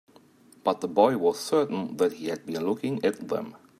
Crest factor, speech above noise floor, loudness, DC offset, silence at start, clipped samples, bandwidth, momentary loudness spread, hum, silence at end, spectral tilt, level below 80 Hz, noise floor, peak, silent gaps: 20 dB; 30 dB; -27 LUFS; under 0.1%; 0.65 s; under 0.1%; 15 kHz; 10 LU; none; 0.25 s; -5.5 dB/octave; -74 dBFS; -56 dBFS; -6 dBFS; none